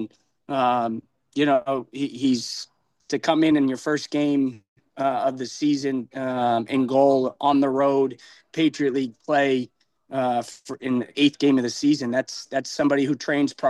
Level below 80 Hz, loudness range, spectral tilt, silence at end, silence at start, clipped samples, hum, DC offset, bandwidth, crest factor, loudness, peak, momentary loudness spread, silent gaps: -72 dBFS; 3 LU; -5 dB/octave; 0 s; 0 s; under 0.1%; none; under 0.1%; 11.5 kHz; 16 dB; -23 LUFS; -6 dBFS; 10 LU; 4.68-4.76 s